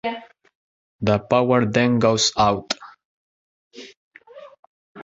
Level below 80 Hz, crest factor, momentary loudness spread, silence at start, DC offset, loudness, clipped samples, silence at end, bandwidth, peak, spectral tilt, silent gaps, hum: -52 dBFS; 20 dB; 22 LU; 0.05 s; under 0.1%; -19 LUFS; under 0.1%; 0 s; 8 kHz; -4 dBFS; -4.5 dB/octave; 0.55-0.99 s, 3.05-3.71 s, 3.97-4.11 s, 4.59-4.95 s; none